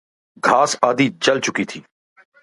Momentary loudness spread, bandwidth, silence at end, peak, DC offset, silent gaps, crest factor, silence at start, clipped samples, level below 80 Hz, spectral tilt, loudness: 11 LU; 11.5 kHz; 0.65 s; 0 dBFS; under 0.1%; none; 20 dB; 0.45 s; under 0.1%; -64 dBFS; -3.5 dB/octave; -18 LUFS